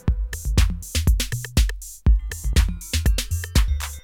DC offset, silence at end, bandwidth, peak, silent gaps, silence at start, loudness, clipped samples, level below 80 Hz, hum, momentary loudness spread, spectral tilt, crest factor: under 0.1%; 0.05 s; 17.5 kHz; -6 dBFS; none; 0.05 s; -23 LUFS; under 0.1%; -22 dBFS; none; 3 LU; -4 dB/octave; 16 dB